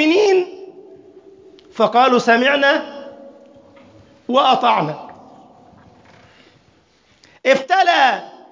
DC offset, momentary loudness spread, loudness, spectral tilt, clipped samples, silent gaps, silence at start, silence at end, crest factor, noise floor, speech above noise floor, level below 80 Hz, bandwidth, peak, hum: under 0.1%; 22 LU; -15 LUFS; -4 dB/octave; under 0.1%; none; 0 s; 0.25 s; 18 dB; -56 dBFS; 41 dB; -66 dBFS; 7.6 kHz; -2 dBFS; none